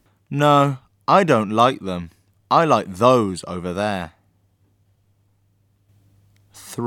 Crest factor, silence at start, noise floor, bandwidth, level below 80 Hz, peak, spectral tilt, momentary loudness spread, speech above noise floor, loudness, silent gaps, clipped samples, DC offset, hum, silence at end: 20 dB; 0.3 s; -62 dBFS; 17.5 kHz; -58 dBFS; 0 dBFS; -6 dB/octave; 14 LU; 44 dB; -19 LUFS; none; under 0.1%; under 0.1%; none; 0 s